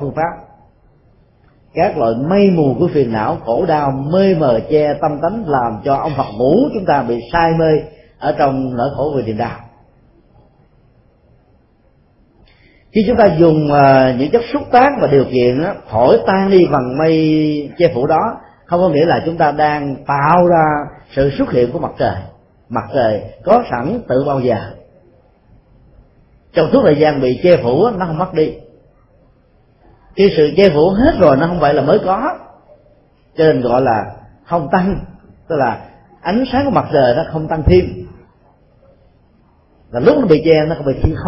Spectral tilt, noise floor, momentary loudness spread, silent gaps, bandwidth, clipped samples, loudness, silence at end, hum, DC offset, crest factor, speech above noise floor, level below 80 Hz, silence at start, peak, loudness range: -10 dB/octave; -52 dBFS; 10 LU; none; 5.8 kHz; under 0.1%; -14 LUFS; 0 s; none; under 0.1%; 14 dB; 40 dB; -36 dBFS; 0 s; 0 dBFS; 6 LU